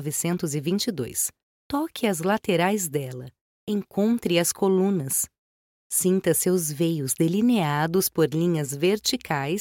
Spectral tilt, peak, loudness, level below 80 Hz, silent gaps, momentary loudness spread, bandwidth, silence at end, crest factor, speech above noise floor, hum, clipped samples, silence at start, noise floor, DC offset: -4.5 dB/octave; -8 dBFS; -24 LUFS; -62 dBFS; 1.43-1.70 s, 3.41-3.67 s, 5.38-5.90 s; 7 LU; 17 kHz; 0 s; 18 dB; over 66 dB; none; under 0.1%; 0 s; under -90 dBFS; under 0.1%